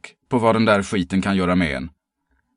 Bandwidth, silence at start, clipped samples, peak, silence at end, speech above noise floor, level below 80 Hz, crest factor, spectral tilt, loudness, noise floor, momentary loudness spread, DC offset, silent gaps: 11 kHz; 0.05 s; under 0.1%; -2 dBFS; 0.65 s; 50 dB; -44 dBFS; 18 dB; -6 dB/octave; -20 LUFS; -69 dBFS; 9 LU; under 0.1%; none